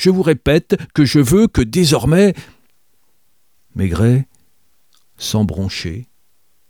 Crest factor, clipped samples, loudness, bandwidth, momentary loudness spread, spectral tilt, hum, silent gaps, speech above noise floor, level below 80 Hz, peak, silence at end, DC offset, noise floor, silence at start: 16 dB; under 0.1%; -15 LUFS; 19.5 kHz; 15 LU; -6 dB/octave; none; none; 50 dB; -36 dBFS; 0 dBFS; 0.65 s; 0.2%; -64 dBFS; 0 s